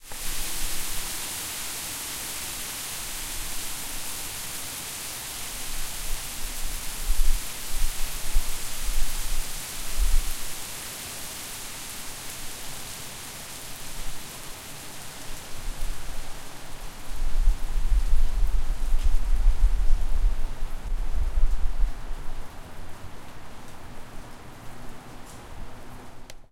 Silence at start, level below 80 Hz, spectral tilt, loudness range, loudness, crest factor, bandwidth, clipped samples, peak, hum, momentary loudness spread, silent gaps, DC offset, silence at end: 0.05 s; -26 dBFS; -2 dB/octave; 8 LU; -32 LUFS; 18 dB; 16.5 kHz; under 0.1%; -6 dBFS; none; 15 LU; none; under 0.1%; 0.1 s